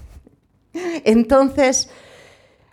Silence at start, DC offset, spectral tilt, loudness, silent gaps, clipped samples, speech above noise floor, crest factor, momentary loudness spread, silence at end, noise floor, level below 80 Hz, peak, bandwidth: 0 s; under 0.1%; -3.5 dB/octave; -17 LUFS; none; under 0.1%; 39 dB; 18 dB; 15 LU; 0.9 s; -55 dBFS; -44 dBFS; -2 dBFS; 13.5 kHz